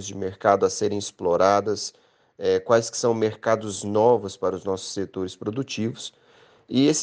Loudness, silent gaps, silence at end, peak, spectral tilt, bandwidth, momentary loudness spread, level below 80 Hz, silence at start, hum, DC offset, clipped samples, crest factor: -24 LUFS; none; 0 s; -4 dBFS; -4.5 dB/octave; 10 kHz; 11 LU; -66 dBFS; 0 s; none; under 0.1%; under 0.1%; 20 dB